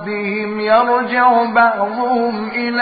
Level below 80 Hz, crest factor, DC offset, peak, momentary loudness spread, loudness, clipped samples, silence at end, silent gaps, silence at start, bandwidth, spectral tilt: -60 dBFS; 14 dB; under 0.1%; 0 dBFS; 8 LU; -15 LUFS; under 0.1%; 0 s; none; 0 s; 5 kHz; -10.5 dB/octave